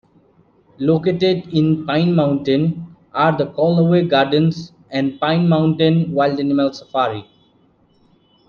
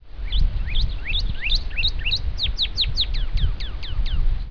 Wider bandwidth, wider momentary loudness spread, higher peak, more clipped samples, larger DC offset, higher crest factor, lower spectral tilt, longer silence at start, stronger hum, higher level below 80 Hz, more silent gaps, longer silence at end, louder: first, 6.8 kHz vs 5.4 kHz; about the same, 7 LU vs 7 LU; first, -2 dBFS vs -8 dBFS; neither; second, under 0.1% vs 3%; about the same, 16 dB vs 14 dB; first, -8.5 dB/octave vs -4 dB/octave; first, 0.8 s vs 0 s; neither; second, -54 dBFS vs -22 dBFS; neither; first, 1.25 s vs 0 s; first, -17 LUFS vs -24 LUFS